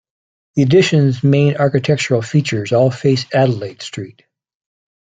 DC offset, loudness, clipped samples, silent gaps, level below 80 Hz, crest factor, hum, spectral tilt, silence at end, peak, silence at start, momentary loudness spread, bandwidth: under 0.1%; -15 LUFS; under 0.1%; none; -56 dBFS; 14 dB; none; -6.5 dB/octave; 0.95 s; -2 dBFS; 0.55 s; 15 LU; 9 kHz